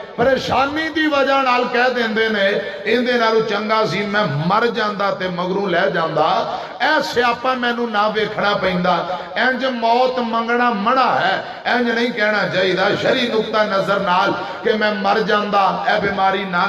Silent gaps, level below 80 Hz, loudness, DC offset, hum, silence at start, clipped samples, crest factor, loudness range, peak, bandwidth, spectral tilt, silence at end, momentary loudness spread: none; -54 dBFS; -17 LUFS; under 0.1%; none; 0 s; under 0.1%; 14 dB; 1 LU; -4 dBFS; 14 kHz; -5 dB/octave; 0 s; 4 LU